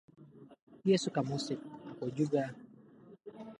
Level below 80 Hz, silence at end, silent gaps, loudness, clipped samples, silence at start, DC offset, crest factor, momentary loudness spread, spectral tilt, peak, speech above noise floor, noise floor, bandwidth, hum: -78 dBFS; 0.05 s; 0.62-0.67 s; -35 LUFS; under 0.1%; 0.2 s; under 0.1%; 20 dB; 22 LU; -6 dB/octave; -16 dBFS; 25 dB; -58 dBFS; 11.5 kHz; none